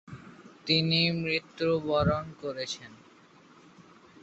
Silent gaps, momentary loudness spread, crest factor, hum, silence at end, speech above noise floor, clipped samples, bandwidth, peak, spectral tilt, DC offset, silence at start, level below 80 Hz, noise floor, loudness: none; 16 LU; 20 dB; none; 0.4 s; 28 dB; under 0.1%; 8.2 kHz; -12 dBFS; -5.5 dB/octave; under 0.1%; 0.1 s; -54 dBFS; -57 dBFS; -28 LUFS